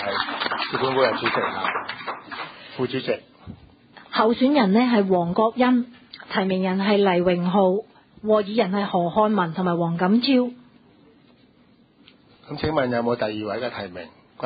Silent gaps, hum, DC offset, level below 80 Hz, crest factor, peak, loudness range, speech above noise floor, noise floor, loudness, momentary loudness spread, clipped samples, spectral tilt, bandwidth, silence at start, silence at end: none; none; under 0.1%; -56 dBFS; 18 dB; -6 dBFS; 7 LU; 35 dB; -56 dBFS; -22 LUFS; 14 LU; under 0.1%; -11 dB/octave; 5 kHz; 0 s; 0 s